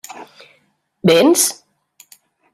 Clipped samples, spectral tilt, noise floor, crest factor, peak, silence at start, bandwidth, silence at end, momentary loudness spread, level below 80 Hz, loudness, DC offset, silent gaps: under 0.1%; -3.5 dB/octave; -61 dBFS; 18 dB; 0 dBFS; 0.1 s; 16 kHz; 1 s; 26 LU; -64 dBFS; -14 LUFS; under 0.1%; none